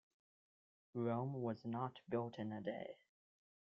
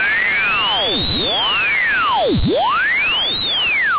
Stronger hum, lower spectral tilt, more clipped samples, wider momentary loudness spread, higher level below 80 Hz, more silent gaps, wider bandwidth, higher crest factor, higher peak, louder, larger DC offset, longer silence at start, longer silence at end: neither; about the same, -7 dB/octave vs -7 dB/octave; neither; first, 10 LU vs 2 LU; second, -84 dBFS vs -34 dBFS; neither; first, 6.8 kHz vs 4 kHz; first, 18 dB vs 8 dB; second, -28 dBFS vs -10 dBFS; second, -45 LUFS vs -14 LUFS; neither; first, 0.95 s vs 0 s; first, 0.85 s vs 0 s